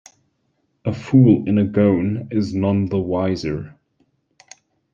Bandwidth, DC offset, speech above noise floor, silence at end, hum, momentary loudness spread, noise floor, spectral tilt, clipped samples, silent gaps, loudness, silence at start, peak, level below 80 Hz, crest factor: 7.4 kHz; under 0.1%; 51 dB; 1.25 s; none; 13 LU; -68 dBFS; -8.5 dB/octave; under 0.1%; none; -19 LUFS; 0.85 s; -2 dBFS; -52 dBFS; 18 dB